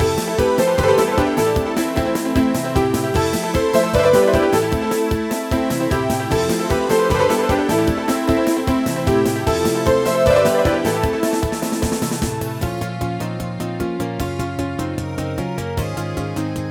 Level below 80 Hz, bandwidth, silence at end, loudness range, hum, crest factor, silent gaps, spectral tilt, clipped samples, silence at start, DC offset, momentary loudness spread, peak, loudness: -32 dBFS; 19 kHz; 0 s; 7 LU; none; 16 dB; none; -5.5 dB/octave; under 0.1%; 0 s; under 0.1%; 9 LU; -2 dBFS; -19 LUFS